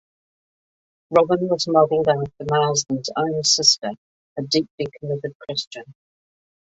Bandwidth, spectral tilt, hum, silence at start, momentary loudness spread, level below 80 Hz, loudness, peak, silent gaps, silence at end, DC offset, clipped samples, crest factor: 8 kHz; -3.5 dB/octave; none; 1.1 s; 14 LU; -60 dBFS; -20 LUFS; -2 dBFS; 3.98-4.36 s, 4.70-4.78 s, 5.35-5.40 s, 5.67-5.71 s; 0.75 s; under 0.1%; under 0.1%; 20 dB